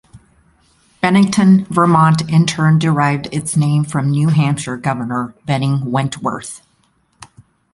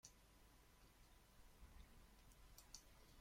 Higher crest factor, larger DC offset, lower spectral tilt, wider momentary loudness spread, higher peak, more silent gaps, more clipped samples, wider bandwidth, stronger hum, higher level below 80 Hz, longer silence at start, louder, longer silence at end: second, 14 dB vs 28 dB; neither; first, -6 dB/octave vs -2.5 dB/octave; first, 11 LU vs 7 LU; first, 0 dBFS vs -38 dBFS; neither; neither; second, 11.5 kHz vs 16.5 kHz; neither; first, -50 dBFS vs -70 dBFS; about the same, 0.15 s vs 0.05 s; first, -15 LUFS vs -66 LUFS; first, 0.5 s vs 0 s